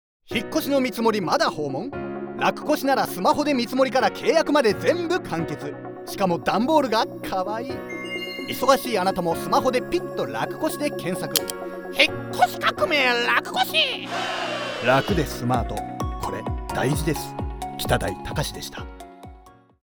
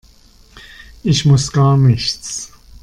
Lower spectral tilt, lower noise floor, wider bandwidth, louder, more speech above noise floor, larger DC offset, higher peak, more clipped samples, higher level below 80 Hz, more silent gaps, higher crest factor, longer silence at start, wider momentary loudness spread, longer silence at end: about the same, -4.5 dB/octave vs -5.5 dB/octave; about the same, -49 dBFS vs -46 dBFS; first, over 20 kHz vs 11 kHz; second, -23 LUFS vs -14 LUFS; second, 26 dB vs 33 dB; neither; about the same, 0 dBFS vs -2 dBFS; neither; about the same, -42 dBFS vs -40 dBFS; neither; first, 24 dB vs 14 dB; second, 0.25 s vs 0.55 s; second, 11 LU vs 14 LU; about the same, 0.45 s vs 0.35 s